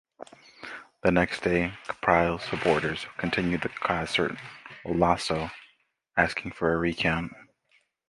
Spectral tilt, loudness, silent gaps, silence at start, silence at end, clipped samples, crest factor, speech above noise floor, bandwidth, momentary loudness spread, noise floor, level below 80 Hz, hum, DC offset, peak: -5.5 dB/octave; -27 LUFS; none; 0.2 s; 0.65 s; under 0.1%; 24 dB; 41 dB; 11.5 kHz; 17 LU; -68 dBFS; -50 dBFS; none; under 0.1%; -4 dBFS